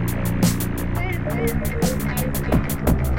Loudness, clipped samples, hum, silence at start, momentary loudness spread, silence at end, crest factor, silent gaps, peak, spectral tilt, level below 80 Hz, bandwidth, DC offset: -22 LUFS; under 0.1%; none; 0 s; 4 LU; 0 s; 14 dB; none; -6 dBFS; -6 dB/octave; -28 dBFS; 17 kHz; under 0.1%